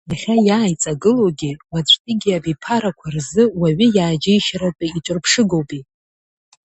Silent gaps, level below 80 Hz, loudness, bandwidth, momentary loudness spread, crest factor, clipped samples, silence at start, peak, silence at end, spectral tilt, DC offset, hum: 1.99-2.05 s; -50 dBFS; -17 LUFS; 8.6 kHz; 10 LU; 16 dB; under 0.1%; 0.1 s; 0 dBFS; 0.85 s; -4.5 dB/octave; under 0.1%; none